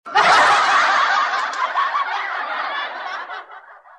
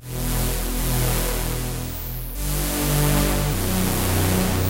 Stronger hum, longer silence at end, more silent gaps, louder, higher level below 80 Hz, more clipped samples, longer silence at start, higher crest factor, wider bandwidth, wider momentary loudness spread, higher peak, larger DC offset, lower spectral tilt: neither; first, 0.2 s vs 0 s; neither; first, -17 LUFS vs -23 LUFS; second, -66 dBFS vs -28 dBFS; neither; about the same, 0.05 s vs 0 s; about the same, 16 dB vs 16 dB; second, 12.5 kHz vs 17 kHz; first, 16 LU vs 9 LU; about the same, -4 dBFS vs -6 dBFS; neither; second, -0.5 dB/octave vs -4.5 dB/octave